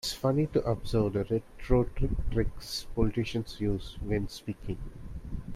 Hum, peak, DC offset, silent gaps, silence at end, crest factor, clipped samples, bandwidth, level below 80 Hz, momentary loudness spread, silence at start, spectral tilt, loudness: none; -10 dBFS; under 0.1%; none; 0 s; 20 dB; under 0.1%; 16 kHz; -38 dBFS; 12 LU; 0.05 s; -6.5 dB/octave; -31 LUFS